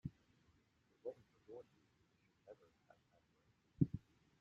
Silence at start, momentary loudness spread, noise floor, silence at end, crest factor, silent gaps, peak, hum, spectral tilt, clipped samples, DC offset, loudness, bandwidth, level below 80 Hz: 0.05 s; 23 LU; -78 dBFS; 0.4 s; 30 dB; none; -20 dBFS; none; -11.5 dB/octave; under 0.1%; under 0.1%; -46 LUFS; 7.2 kHz; -72 dBFS